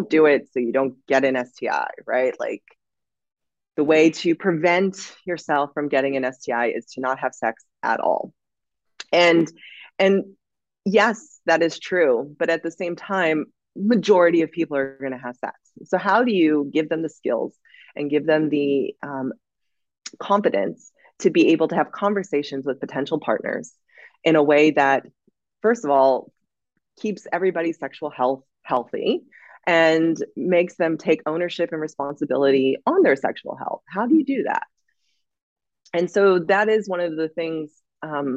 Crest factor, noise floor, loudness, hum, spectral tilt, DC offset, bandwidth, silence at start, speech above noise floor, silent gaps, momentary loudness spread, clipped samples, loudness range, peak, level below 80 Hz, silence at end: 18 dB; -88 dBFS; -21 LUFS; none; -5.5 dB/octave; under 0.1%; 8 kHz; 0 s; 67 dB; 35.42-35.56 s; 13 LU; under 0.1%; 4 LU; -4 dBFS; -74 dBFS; 0 s